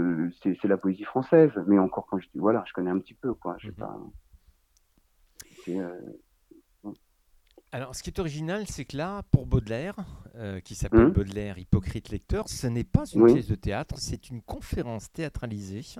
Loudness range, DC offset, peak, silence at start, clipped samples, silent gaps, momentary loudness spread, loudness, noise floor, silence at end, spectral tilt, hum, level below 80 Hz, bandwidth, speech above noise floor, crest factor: 16 LU; under 0.1%; -4 dBFS; 0 s; under 0.1%; none; 19 LU; -27 LUFS; -66 dBFS; 0 s; -7 dB/octave; none; -42 dBFS; 14.5 kHz; 39 dB; 24 dB